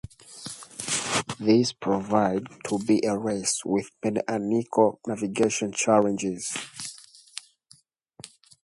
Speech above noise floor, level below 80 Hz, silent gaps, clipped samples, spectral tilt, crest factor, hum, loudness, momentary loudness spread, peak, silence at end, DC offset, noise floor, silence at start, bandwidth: 35 dB; -62 dBFS; none; under 0.1%; -4 dB/octave; 20 dB; none; -25 LUFS; 19 LU; -6 dBFS; 0.35 s; under 0.1%; -59 dBFS; 0.3 s; 11.5 kHz